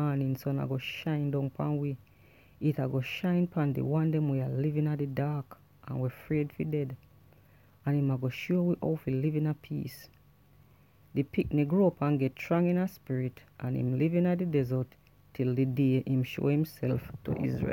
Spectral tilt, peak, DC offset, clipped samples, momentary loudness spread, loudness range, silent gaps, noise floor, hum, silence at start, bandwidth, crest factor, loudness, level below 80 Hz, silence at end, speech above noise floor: -9 dB/octave; -14 dBFS; under 0.1%; under 0.1%; 10 LU; 4 LU; none; -61 dBFS; none; 0 s; 17 kHz; 16 dB; -31 LUFS; -60 dBFS; 0 s; 31 dB